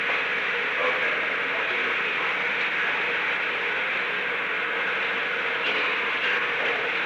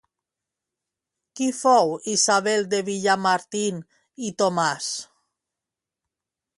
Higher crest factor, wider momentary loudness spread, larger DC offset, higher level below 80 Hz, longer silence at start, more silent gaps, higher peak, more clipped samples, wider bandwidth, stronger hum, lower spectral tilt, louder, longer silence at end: second, 12 dB vs 18 dB; second, 2 LU vs 12 LU; neither; first, -66 dBFS vs -74 dBFS; second, 0 s vs 1.35 s; neither; second, -12 dBFS vs -6 dBFS; neither; first, over 20 kHz vs 11.5 kHz; neither; about the same, -3 dB/octave vs -3 dB/octave; about the same, -24 LUFS vs -22 LUFS; second, 0 s vs 1.55 s